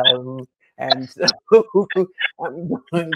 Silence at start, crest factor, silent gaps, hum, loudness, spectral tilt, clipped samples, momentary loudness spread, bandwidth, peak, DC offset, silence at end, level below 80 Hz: 0 s; 18 dB; none; none; -19 LUFS; -4 dB/octave; under 0.1%; 15 LU; 10.5 kHz; 0 dBFS; under 0.1%; 0 s; -66 dBFS